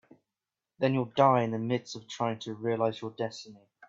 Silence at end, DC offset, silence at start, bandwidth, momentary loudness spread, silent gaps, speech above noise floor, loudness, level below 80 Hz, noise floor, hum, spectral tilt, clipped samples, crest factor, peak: 0 s; under 0.1%; 0.8 s; 7.8 kHz; 13 LU; none; 60 dB; -30 LUFS; -74 dBFS; -90 dBFS; none; -6.5 dB/octave; under 0.1%; 22 dB; -10 dBFS